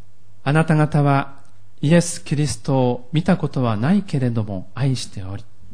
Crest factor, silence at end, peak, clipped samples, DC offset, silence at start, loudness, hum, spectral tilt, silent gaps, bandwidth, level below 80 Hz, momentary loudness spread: 16 dB; 0.3 s; -4 dBFS; under 0.1%; 3%; 0.45 s; -20 LUFS; none; -6.5 dB/octave; none; 10.5 kHz; -50 dBFS; 12 LU